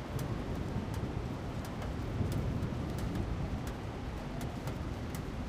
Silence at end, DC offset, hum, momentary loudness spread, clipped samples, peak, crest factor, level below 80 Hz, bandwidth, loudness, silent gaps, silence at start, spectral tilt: 0 s; under 0.1%; none; 5 LU; under 0.1%; -22 dBFS; 16 dB; -44 dBFS; 16 kHz; -38 LUFS; none; 0 s; -7 dB/octave